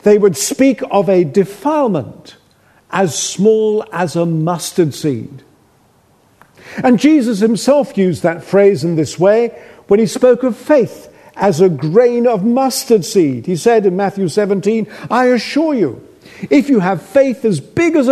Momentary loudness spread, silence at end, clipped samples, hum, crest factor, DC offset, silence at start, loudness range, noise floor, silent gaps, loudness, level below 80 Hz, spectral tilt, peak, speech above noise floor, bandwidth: 6 LU; 0 s; under 0.1%; none; 14 dB; under 0.1%; 0.05 s; 3 LU; -52 dBFS; none; -13 LUFS; -56 dBFS; -5.5 dB/octave; 0 dBFS; 39 dB; 13.5 kHz